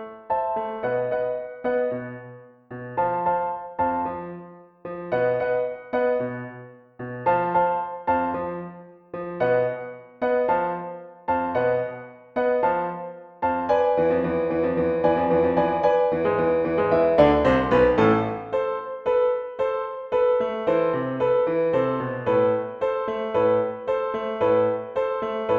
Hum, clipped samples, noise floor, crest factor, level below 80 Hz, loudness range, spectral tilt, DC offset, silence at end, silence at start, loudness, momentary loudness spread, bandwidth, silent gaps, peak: none; under 0.1%; -44 dBFS; 18 dB; -50 dBFS; 7 LU; -8.5 dB/octave; under 0.1%; 0 s; 0 s; -23 LUFS; 14 LU; 5.4 kHz; none; -4 dBFS